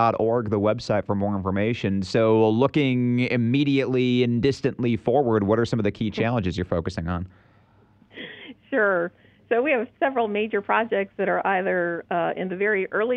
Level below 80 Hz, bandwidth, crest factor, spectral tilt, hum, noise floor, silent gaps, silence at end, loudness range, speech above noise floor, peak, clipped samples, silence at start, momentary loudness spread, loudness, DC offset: -52 dBFS; 9 kHz; 16 dB; -7.5 dB/octave; none; -57 dBFS; none; 0 s; 6 LU; 34 dB; -6 dBFS; under 0.1%; 0 s; 6 LU; -23 LUFS; under 0.1%